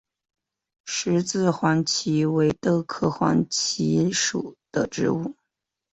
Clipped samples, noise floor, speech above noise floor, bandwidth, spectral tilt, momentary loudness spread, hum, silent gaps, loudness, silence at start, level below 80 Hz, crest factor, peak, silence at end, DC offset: under 0.1%; -83 dBFS; 60 dB; 8.2 kHz; -4.5 dB/octave; 8 LU; none; none; -23 LUFS; 0.85 s; -58 dBFS; 18 dB; -6 dBFS; 0.6 s; under 0.1%